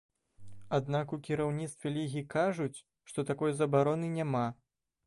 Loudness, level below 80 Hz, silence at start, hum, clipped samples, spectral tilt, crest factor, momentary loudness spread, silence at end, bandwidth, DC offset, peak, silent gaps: -33 LUFS; -66 dBFS; 0.4 s; none; under 0.1%; -7 dB/octave; 18 dB; 9 LU; 0.55 s; 11.5 kHz; under 0.1%; -16 dBFS; none